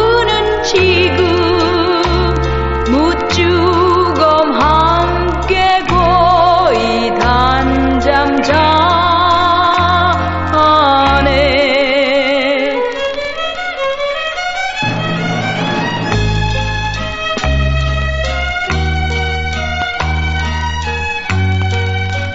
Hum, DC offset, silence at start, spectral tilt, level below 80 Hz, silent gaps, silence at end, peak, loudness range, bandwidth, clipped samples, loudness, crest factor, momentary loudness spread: none; under 0.1%; 0 s; -3.5 dB/octave; -24 dBFS; none; 0 s; 0 dBFS; 6 LU; 8 kHz; under 0.1%; -13 LUFS; 12 dB; 7 LU